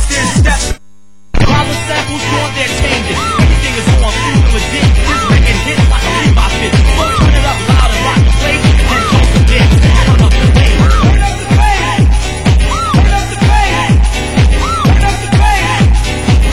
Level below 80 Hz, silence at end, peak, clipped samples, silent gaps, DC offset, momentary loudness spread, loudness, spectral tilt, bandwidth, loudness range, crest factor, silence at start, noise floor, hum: -12 dBFS; 0 s; 0 dBFS; under 0.1%; none; 3%; 5 LU; -10 LUFS; -5 dB/octave; 16 kHz; 3 LU; 8 dB; 0 s; -48 dBFS; none